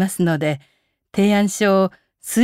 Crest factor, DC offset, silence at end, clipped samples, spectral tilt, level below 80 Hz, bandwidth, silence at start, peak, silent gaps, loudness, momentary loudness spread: 14 dB; under 0.1%; 0 s; under 0.1%; -5.5 dB/octave; -64 dBFS; 16 kHz; 0 s; -6 dBFS; none; -19 LUFS; 12 LU